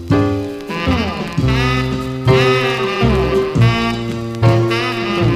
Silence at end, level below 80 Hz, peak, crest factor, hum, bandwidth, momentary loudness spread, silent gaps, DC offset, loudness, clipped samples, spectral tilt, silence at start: 0 s; -30 dBFS; 0 dBFS; 14 dB; none; 14 kHz; 7 LU; none; 0.2%; -16 LUFS; under 0.1%; -6.5 dB/octave; 0 s